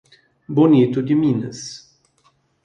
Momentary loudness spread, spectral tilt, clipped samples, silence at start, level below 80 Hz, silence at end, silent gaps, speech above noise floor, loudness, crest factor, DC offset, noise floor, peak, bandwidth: 19 LU; -7.5 dB/octave; under 0.1%; 0.5 s; -62 dBFS; 0.85 s; none; 45 dB; -17 LUFS; 16 dB; under 0.1%; -61 dBFS; -2 dBFS; 9 kHz